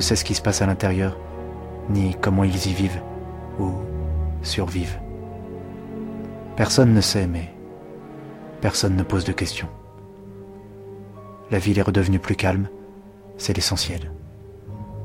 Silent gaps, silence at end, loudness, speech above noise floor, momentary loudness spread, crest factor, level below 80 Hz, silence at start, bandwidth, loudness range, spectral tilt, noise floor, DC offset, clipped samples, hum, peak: none; 0 s; -23 LUFS; 22 dB; 21 LU; 20 dB; -38 dBFS; 0 s; 16 kHz; 5 LU; -5 dB/octave; -43 dBFS; under 0.1%; under 0.1%; none; -4 dBFS